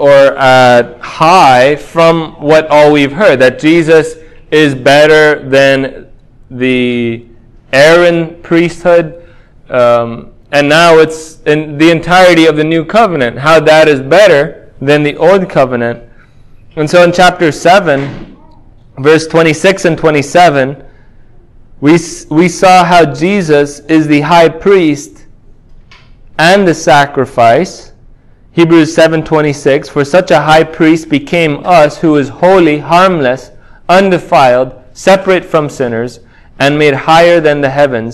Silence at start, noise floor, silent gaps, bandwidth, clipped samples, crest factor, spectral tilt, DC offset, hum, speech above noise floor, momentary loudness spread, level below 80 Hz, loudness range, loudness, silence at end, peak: 0 s; -38 dBFS; none; 16 kHz; 4%; 8 dB; -5.5 dB/octave; under 0.1%; none; 31 dB; 10 LU; -40 dBFS; 3 LU; -7 LUFS; 0 s; 0 dBFS